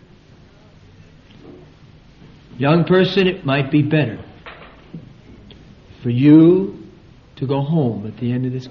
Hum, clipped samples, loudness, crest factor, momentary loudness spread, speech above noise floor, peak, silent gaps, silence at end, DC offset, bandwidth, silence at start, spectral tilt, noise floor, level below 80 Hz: none; under 0.1%; -16 LUFS; 18 dB; 27 LU; 31 dB; 0 dBFS; none; 0 s; under 0.1%; 6.2 kHz; 1.45 s; -6.5 dB/octave; -46 dBFS; -50 dBFS